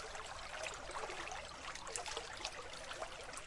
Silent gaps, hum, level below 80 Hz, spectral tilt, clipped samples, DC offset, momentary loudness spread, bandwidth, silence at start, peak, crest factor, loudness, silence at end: none; none; -60 dBFS; -1 dB/octave; under 0.1%; under 0.1%; 4 LU; 11.5 kHz; 0 s; -22 dBFS; 26 dB; -46 LUFS; 0 s